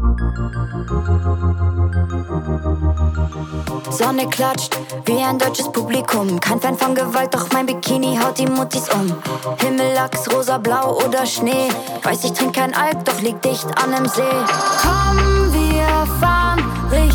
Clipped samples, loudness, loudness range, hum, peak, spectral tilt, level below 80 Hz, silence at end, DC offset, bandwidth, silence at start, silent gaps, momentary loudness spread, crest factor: under 0.1%; -18 LUFS; 4 LU; none; -4 dBFS; -5 dB/octave; -24 dBFS; 0 s; under 0.1%; over 20 kHz; 0 s; none; 7 LU; 14 dB